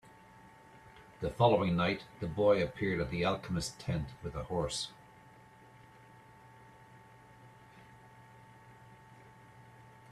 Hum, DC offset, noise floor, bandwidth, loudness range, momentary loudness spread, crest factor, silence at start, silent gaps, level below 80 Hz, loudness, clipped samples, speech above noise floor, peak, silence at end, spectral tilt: none; under 0.1%; -58 dBFS; 13.5 kHz; 11 LU; 28 LU; 24 dB; 0.75 s; none; -58 dBFS; -33 LUFS; under 0.1%; 26 dB; -12 dBFS; 0.2 s; -5.5 dB/octave